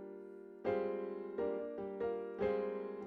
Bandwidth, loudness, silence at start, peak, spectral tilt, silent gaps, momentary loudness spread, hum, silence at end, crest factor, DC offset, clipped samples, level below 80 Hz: 5 kHz; -40 LUFS; 0 s; -24 dBFS; -8.5 dB/octave; none; 9 LU; none; 0 s; 16 dB; under 0.1%; under 0.1%; -70 dBFS